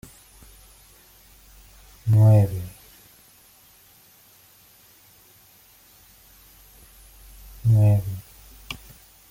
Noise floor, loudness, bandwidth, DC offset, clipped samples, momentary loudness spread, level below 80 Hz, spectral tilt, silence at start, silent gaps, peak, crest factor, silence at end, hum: -54 dBFS; -20 LUFS; 16 kHz; under 0.1%; under 0.1%; 30 LU; -50 dBFS; -8 dB/octave; 2.05 s; none; -8 dBFS; 18 dB; 0.55 s; none